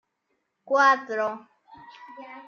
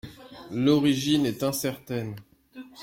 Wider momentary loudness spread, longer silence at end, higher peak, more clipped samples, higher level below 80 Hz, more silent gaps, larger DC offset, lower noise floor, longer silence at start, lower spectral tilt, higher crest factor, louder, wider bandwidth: about the same, 24 LU vs 23 LU; about the same, 0.05 s vs 0 s; first, -6 dBFS vs -10 dBFS; neither; second, -80 dBFS vs -60 dBFS; neither; neither; first, -76 dBFS vs -47 dBFS; first, 0.7 s vs 0.05 s; second, -2.5 dB/octave vs -5 dB/octave; about the same, 20 dB vs 18 dB; about the same, -23 LUFS vs -25 LUFS; second, 7 kHz vs 16.5 kHz